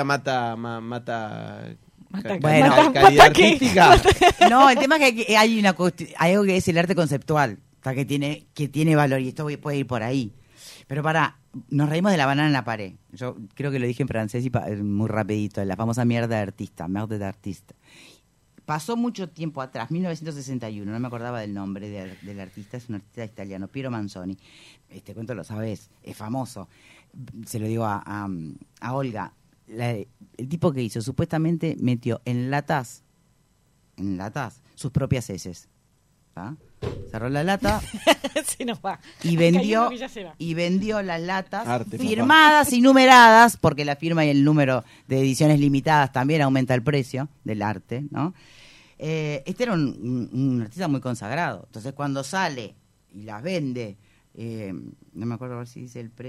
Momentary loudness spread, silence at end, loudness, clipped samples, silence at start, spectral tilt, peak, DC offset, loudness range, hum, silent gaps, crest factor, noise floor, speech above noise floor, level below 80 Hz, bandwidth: 21 LU; 0 s; -21 LUFS; under 0.1%; 0 s; -5 dB/octave; 0 dBFS; under 0.1%; 18 LU; none; none; 22 dB; -63 dBFS; 41 dB; -46 dBFS; 16 kHz